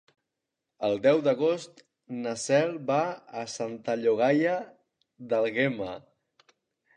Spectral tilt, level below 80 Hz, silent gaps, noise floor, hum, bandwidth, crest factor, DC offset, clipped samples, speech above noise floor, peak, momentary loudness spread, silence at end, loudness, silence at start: -5 dB/octave; -72 dBFS; none; -85 dBFS; none; 10.5 kHz; 18 dB; under 0.1%; under 0.1%; 59 dB; -10 dBFS; 14 LU; 0.95 s; -27 LUFS; 0.8 s